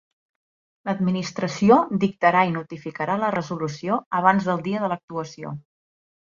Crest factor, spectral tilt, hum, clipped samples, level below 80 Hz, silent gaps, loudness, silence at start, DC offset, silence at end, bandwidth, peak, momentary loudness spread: 22 dB; -6.5 dB/octave; none; under 0.1%; -62 dBFS; 4.06-4.11 s, 5.03-5.08 s; -22 LUFS; 0.85 s; under 0.1%; 0.7 s; 7.4 kHz; -2 dBFS; 16 LU